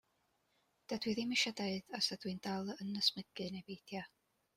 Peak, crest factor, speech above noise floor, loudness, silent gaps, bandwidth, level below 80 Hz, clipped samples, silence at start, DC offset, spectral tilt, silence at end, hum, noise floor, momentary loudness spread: -18 dBFS; 22 dB; 40 dB; -39 LUFS; none; 16 kHz; -78 dBFS; under 0.1%; 0.9 s; under 0.1%; -3.5 dB/octave; 0.5 s; none; -80 dBFS; 13 LU